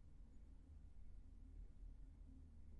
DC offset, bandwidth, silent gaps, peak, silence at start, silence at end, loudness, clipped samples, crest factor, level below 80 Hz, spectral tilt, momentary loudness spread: under 0.1%; 4.6 kHz; none; -48 dBFS; 0 s; 0 s; -65 LUFS; under 0.1%; 10 dB; -60 dBFS; -9 dB/octave; 4 LU